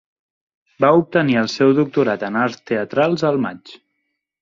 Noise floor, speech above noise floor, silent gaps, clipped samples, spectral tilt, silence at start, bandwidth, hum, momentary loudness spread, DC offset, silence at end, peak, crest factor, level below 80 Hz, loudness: -74 dBFS; 57 dB; none; under 0.1%; -6.5 dB/octave; 0.8 s; 7.6 kHz; none; 7 LU; under 0.1%; 0.65 s; -2 dBFS; 18 dB; -62 dBFS; -18 LUFS